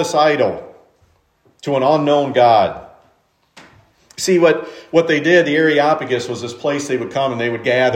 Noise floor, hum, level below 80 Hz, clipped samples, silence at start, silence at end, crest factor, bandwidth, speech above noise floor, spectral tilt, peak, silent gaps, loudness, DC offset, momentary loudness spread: -59 dBFS; none; -62 dBFS; under 0.1%; 0 s; 0 s; 16 dB; 15.5 kHz; 44 dB; -4.5 dB/octave; 0 dBFS; none; -16 LUFS; under 0.1%; 10 LU